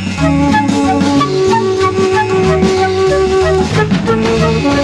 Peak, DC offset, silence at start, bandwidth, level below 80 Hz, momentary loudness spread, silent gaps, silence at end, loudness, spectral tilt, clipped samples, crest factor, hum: 0 dBFS; under 0.1%; 0 s; 11.5 kHz; -30 dBFS; 1 LU; none; 0 s; -12 LUFS; -6 dB/octave; under 0.1%; 10 dB; none